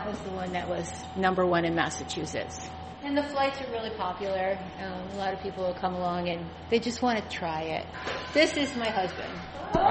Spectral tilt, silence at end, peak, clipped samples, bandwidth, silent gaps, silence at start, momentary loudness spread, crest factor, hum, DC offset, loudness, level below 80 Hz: -4.5 dB/octave; 0 s; -10 dBFS; under 0.1%; 8.4 kHz; none; 0 s; 11 LU; 20 dB; none; under 0.1%; -30 LUFS; -52 dBFS